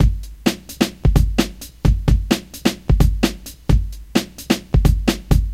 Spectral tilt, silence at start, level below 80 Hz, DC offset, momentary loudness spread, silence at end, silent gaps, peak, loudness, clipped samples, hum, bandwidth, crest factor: -5.5 dB/octave; 0 s; -20 dBFS; under 0.1%; 6 LU; 0 s; none; 0 dBFS; -20 LUFS; under 0.1%; none; 16 kHz; 18 dB